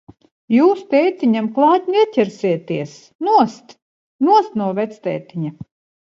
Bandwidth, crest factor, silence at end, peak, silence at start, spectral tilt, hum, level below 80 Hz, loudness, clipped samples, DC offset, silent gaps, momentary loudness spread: 7.6 kHz; 16 dB; 0.4 s; -2 dBFS; 0.5 s; -7 dB/octave; none; -66 dBFS; -17 LUFS; under 0.1%; under 0.1%; 3.15-3.19 s, 3.82-4.19 s; 11 LU